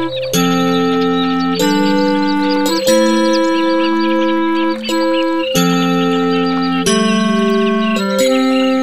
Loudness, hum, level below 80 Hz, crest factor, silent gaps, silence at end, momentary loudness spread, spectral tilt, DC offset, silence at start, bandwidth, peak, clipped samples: -14 LUFS; none; -50 dBFS; 12 dB; none; 0 s; 3 LU; -4.5 dB/octave; 2%; 0 s; 15 kHz; 0 dBFS; under 0.1%